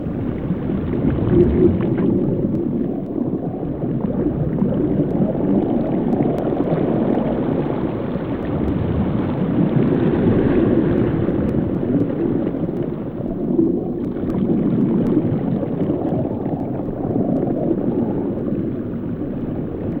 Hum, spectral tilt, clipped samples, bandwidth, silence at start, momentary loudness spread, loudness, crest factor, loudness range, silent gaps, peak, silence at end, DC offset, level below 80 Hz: none; -11.5 dB/octave; under 0.1%; 4.3 kHz; 0 s; 8 LU; -20 LUFS; 16 dB; 3 LU; none; -2 dBFS; 0 s; under 0.1%; -36 dBFS